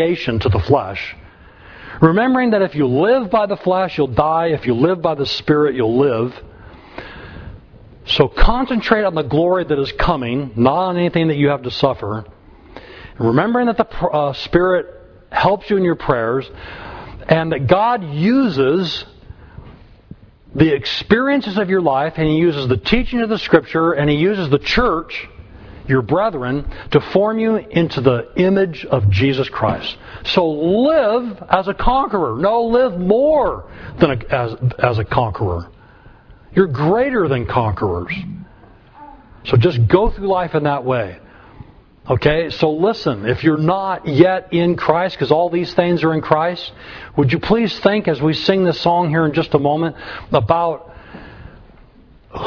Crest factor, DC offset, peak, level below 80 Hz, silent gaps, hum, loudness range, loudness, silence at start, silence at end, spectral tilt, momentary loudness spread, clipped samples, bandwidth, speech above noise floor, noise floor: 16 dB; under 0.1%; 0 dBFS; -32 dBFS; none; none; 3 LU; -17 LUFS; 0 s; 0 s; -8 dB/octave; 12 LU; under 0.1%; 5.4 kHz; 30 dB; -46 dBFS